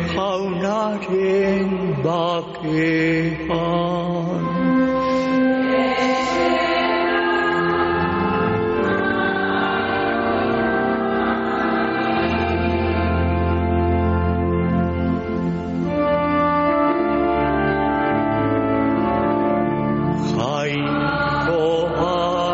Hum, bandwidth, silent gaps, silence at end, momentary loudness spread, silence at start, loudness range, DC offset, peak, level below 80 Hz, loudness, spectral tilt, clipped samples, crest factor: none; 8 kHz; none; 0 s; 4 LU; 0 s; 2 LU; under 0.1%; -8 dBFS; -36 dBFS; -20 LUFS; -5 dB/octave; under 0.1%; 12 dB